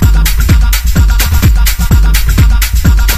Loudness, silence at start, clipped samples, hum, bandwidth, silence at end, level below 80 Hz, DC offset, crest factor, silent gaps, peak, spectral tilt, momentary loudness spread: -10 LUFS; 0 s; 0.3%; none; 16 kHz; 0 s; -8 dBFS; under 0.1%; 6 dB; none; 0 dBFS; -4.5 dB/octave; 1 LU